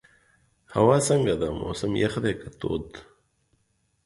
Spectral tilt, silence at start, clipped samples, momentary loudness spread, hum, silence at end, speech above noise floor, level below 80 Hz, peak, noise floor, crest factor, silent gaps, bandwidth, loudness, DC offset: -5.5 dB/octave; 0.7 s; under 0.1%; 13 LU; none; 1.05 s; 46 dB; -48 dBFS; -6 dBFS; -71 dBFS; 20 dB; none; 11.5 kHz; -25 LUFS; under 0.1%